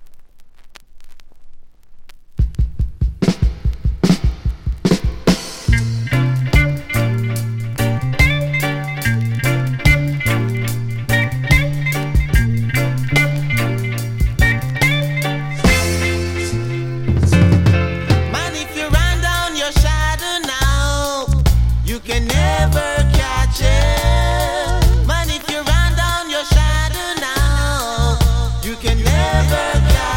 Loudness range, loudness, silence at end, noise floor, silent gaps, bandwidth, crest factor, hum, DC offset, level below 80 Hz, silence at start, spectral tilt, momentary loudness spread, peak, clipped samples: 3 LU; -17 LUFS; 0 s; -38 dBFS; none; 17 kHz; 16 dB; none; under 0.1%; -20 dBFS; 0 s; -5 dB/octave; 6 LU; 0 dBFS; under 0.1%